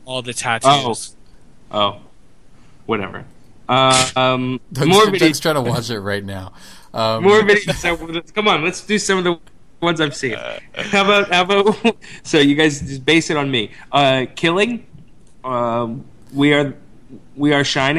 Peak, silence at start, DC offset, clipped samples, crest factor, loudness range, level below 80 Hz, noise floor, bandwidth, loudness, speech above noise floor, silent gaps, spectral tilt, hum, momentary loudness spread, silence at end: 0 dBFS; 0.05 s; 0.8%; under 0.1%; 18 dB; 4 LU; -48 dBFS; -48 dBFS; 15.5 kHz; -16 LUFS; 31 dB; none; -4 dB/octave; none; 15 LU; 0 s